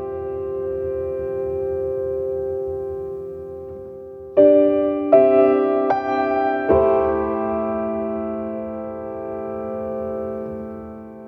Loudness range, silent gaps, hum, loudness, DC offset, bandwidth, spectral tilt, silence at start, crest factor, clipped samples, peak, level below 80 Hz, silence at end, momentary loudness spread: 10 LU; none; none; -21 LUFS; under 0.1%; 5.2 kHz; -9.5 dB/octave; 0 s; 18 dB; under 0.1%; -2 dBFS; -46 dBFS; 0 s; 17 LU